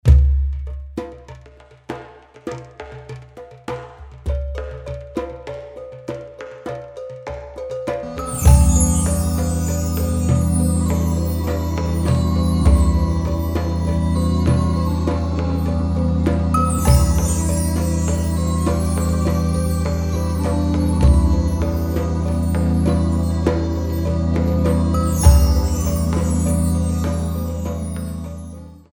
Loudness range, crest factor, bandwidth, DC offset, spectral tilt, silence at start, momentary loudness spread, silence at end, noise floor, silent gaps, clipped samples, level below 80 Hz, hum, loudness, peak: 12 LU; 18 dB; 18 kHz; under 0.1%; -6.5 dB/octave; 0.05 s; 17 LU; 0.15 s; -45 dBFS; none; under 0.1%; -22 dBFS; none; -19 LUFS; 0 dBFS